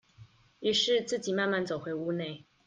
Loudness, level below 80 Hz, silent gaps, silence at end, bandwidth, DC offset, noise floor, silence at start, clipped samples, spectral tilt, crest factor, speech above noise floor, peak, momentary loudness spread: -30 LUFS; -72 dBFS; none; 0.25 s; 9.6 kHz; under 0.1%; -57 dBFS; 0.2 s; under 0.1%; -3.5 dB/octave; 16 dB; 27 dB; -16 dBFS; 9 LU